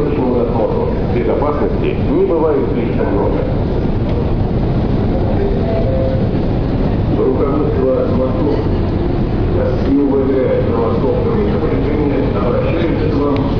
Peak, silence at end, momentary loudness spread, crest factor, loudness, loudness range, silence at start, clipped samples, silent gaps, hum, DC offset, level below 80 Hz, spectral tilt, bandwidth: -4 dBFS; 0 s; 3 LU; 10 dB; -15 LUFS; 1 LU; 0 s; under 0.1%; none; none; 2%; -22 dBFS; -10.5 dB/octave; 5.4 kHz